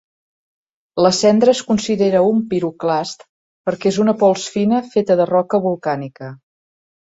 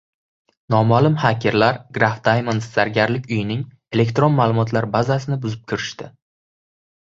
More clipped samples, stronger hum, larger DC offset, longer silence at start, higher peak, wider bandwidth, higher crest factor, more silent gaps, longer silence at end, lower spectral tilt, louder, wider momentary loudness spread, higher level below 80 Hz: neither; neither; neither; first, 0.95 s vs 0.7 s; about the same, -2 dBFS vs -2 dBFS; about the same, 8 kHz vs 7.6 kHz; about the same, 16 dB vs 18 dB; first, 3.29-3.64 s vs none; second, 0.7 s vs 0.9 s; second, -5.5 dB/octave vs -7 dB/octave; about the same, -17 LUFS vs -19 LUFS; first, 14 LU vs 10 LU; second, -58 dBFS vs -52 dBFS